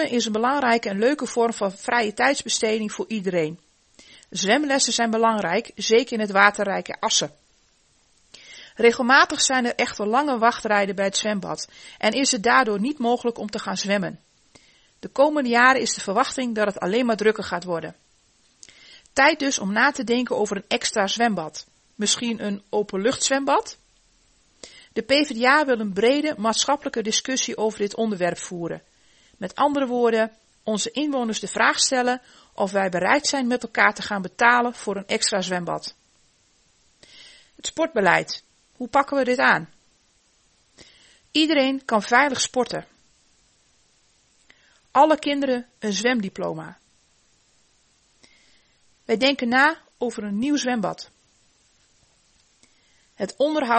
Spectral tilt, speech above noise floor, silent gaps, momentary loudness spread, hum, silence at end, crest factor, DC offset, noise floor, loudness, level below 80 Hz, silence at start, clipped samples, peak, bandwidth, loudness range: -3 dB/octave; 41 dB; none; 13 LU; none; 0 s; 24 dB; under 0.1%; -62 dBFS; -22 LUFS; -64 dBFS; 0 s; under 0.1%; 0 dBFS; 8.8 kHz; 4 LU